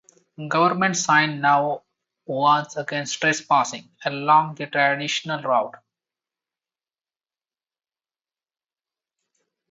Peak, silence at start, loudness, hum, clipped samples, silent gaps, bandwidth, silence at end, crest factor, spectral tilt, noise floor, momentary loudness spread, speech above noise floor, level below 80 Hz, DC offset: -4 dBFS; 0.4 s; -21 LUFS; none; under 0.1%; none; 8 kHz; 4 s; 22 dB; -3.5 dB/octave; under -90 dBFS; 11 LU; over 69 dB; -72 dBFS; under 0.1%